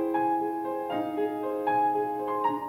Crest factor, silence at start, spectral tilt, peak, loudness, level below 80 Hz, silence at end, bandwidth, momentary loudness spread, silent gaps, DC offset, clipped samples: 14 dB; 0 s; -7 dB/octave; -14 dBFS; -29 LUFS; -72 dBFS; 0 s; 16 kHz; 5 LU; none; under 0.1%; under 0.1%